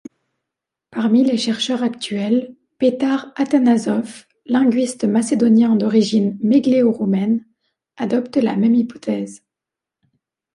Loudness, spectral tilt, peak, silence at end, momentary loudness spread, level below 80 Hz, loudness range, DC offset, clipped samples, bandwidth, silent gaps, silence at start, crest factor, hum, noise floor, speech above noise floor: -18 LUFS; -6 dB/octave; -4 dBFS; 1.2 s; 9 LU; -66 dBFS; 4 LU; under 0.1%; under 0.1%; 11 kHz; none; 0.95 s; 14 dB; none; -86 dBFS; 69 dB